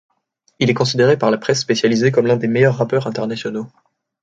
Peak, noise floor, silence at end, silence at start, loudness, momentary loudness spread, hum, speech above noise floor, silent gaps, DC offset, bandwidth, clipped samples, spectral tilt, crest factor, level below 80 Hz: -2 dBFS; -63 dBFS; 0.55 s; 0.6 s; -17 LUFS; 10 LU; none; 47 dB; none; under 0.1%; 9 kHz; under 0.1%; -5.5 dB/octave; 16 dB; -58 dBFS